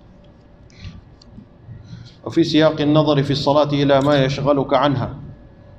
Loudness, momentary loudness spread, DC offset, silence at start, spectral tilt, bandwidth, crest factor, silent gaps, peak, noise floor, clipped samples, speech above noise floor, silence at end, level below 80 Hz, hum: -17 LUFS; 23 LU; under 0.1%; 0.8 s; -7 dB/octave; 8.2 kHz; 16 dB; none; -2 dBFS; -46 dBFS; under 0.1%; 30 dB; 0.45 s; -46 dBFS; none